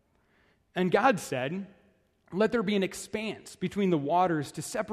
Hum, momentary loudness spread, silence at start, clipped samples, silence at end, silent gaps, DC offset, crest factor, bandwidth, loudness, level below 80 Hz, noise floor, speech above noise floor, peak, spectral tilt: none; 13 LU; 0.75 s; under 0.1%; 0 s; none; under 0.1%; 20 dB; 14 kHz; -29 LUFS; -66 dBFS; -67 dBFS; 39 dB; -10 dBFS; -5.5 dB/octave